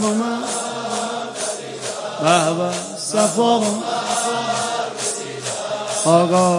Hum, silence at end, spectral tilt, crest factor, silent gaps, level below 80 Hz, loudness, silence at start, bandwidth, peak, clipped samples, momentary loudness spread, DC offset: none; 0 s; -3.5 dB/octave; 18 dB; none; -68 dBFS; -20 LUFS; 0 s; 11.5 kHz; 0 dBFS; under 0.1%; 9 LU; under 0.1%